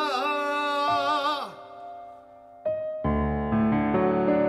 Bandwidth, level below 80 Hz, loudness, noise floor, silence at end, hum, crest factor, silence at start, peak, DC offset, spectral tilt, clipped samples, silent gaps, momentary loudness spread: 12.5 kHz; -42 dBFS; -26 LUFS; -49 dBFS; 0 s; none; 14 dB; 0 s; -12 dBFS; under 0.1%; -6.5 dB/octave; under 0.1%; none; 18 LU